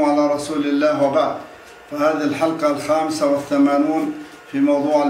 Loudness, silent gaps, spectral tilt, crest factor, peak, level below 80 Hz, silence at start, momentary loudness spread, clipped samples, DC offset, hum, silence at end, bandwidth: -19 LUFS; none; -5.5 dB/octave; 14 dB; -4 dBFS; -60 dBFS; 0 s; 11 LU; under 0.1%; under 0.1%; none; 0 s; 15 kHz